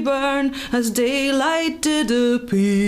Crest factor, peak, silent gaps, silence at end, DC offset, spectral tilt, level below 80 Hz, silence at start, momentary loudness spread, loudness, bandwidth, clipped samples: 12 dB; -6 dBFS; none; 0 s; under 0.1%; -4.5 dB/octave; -48 dBFS; 0 s; 3 LU; -20 LUFS; 16 kHz; under 0.1%